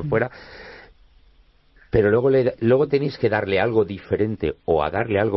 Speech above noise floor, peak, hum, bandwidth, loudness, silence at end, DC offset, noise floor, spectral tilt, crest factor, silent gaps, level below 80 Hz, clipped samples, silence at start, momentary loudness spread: 35 dB; -6 dBFS; none; 6 kHz; -21 LUFS; 0 s; under 0.1%; -55 dBFS; -10 dB/octave; 16 dB; none; -46 dBFS; under 0.1%; 0 s; 11 LU